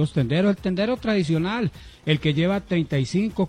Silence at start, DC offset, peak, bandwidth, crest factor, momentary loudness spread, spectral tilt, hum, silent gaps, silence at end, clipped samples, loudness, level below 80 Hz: 0 s; under 0.1%; -8 dBFS; 10.5 kHz; 16 dB; 4 LU; -7 dB/octave; none; none; 0 s; under 0.1%; -23 LUFS; -46 dBFS